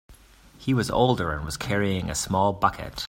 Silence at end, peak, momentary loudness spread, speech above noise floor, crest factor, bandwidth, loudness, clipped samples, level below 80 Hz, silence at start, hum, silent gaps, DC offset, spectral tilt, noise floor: 0 s; -4 dBFS; 6 LU; 27 dB; 22 dB; 16 kHz; -25 LUFS; under 0.1%; -44 dBFS; 0.1 s; none; none; under 0.1%; -5 dB/octave; -52 dBFS